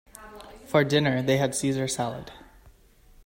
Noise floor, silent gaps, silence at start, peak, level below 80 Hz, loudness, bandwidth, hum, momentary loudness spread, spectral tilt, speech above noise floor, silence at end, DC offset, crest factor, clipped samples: -55 dBFS; none; 0.15 s; -8 dBFS; -56 dBFS; -25 LUFS; 16.5 kHz; none; 23 LU; -5 dB/octave; 31 dB; 0.85 s; under 0.1%; 20 dB; under 0.1%